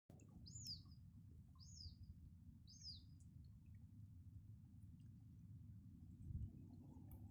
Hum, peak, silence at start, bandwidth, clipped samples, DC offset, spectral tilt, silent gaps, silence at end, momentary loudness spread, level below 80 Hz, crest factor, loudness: none; -40 dBFS; 0.1 s; 9.6 kHz; under 0.1%; under 0.1%; -5 dB/octave; none; 0 s; 10 LU; -66 dBFS; 18 dB; -60 LUFS